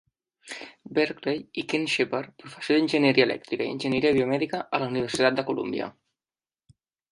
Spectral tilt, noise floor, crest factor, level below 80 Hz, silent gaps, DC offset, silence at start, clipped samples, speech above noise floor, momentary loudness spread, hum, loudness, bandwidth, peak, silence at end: -5 dB/octave; under -90 dBFS; 22 dB; -64 dBFS; none; under 0.1%; 0.45 s; under 0.1%; over 65 dB; 17 LU; none; -25 LUFS; 11.5 kHz; -6 dBFS; 1.2 s